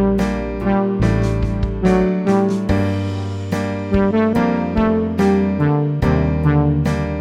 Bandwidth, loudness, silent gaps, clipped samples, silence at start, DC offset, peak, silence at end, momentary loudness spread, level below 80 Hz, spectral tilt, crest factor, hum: 11 kHz; -18 LUFS; none; under 0.1%; 0 s; under 0.1%; -2 dBFS; 0 s; 6 LU; -28 dBFS; -8.5 dB/octave; 14 dB; none